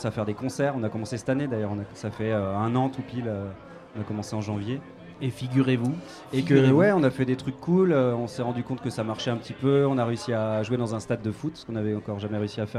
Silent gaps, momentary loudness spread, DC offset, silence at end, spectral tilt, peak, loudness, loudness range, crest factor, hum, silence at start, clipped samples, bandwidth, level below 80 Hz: none; 12 LU; under 0.1%; 0 s; -7 dB/octave; -6 dBFS; -26 LUFS; 7 LU; 20 dB; none; 0 s; under 0.1%; 12 kHz; -60 dBFS